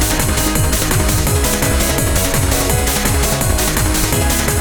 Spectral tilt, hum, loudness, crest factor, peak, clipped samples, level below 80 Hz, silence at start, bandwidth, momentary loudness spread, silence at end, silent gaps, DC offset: -3.5 dB/octave; none; -15 LUFS; 14 dB; 0 dBFS; under 0.1%; -20 dBFS; 0 s; over 20 kHz; 0 LU; 0 s; none; under 0.1%